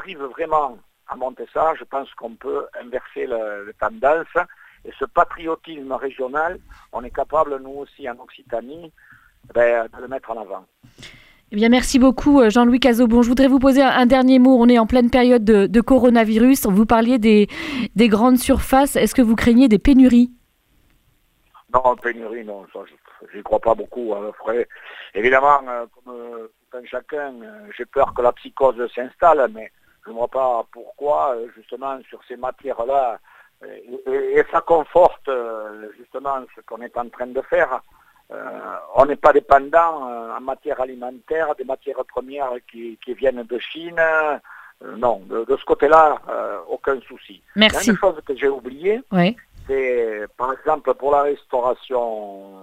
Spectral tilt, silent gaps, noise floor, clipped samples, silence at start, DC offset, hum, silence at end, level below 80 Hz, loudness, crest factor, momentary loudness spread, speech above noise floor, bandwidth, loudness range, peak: -5.5 dB/octave; none; -61 dBFS; under 0.1%; 0 s; under 0.1%; none; 0.15 s; -40 dBFS; -18 LUFS; 18 dB; 19 LU; 42 dB; 16 kHz; 12 LU; 0 dBFS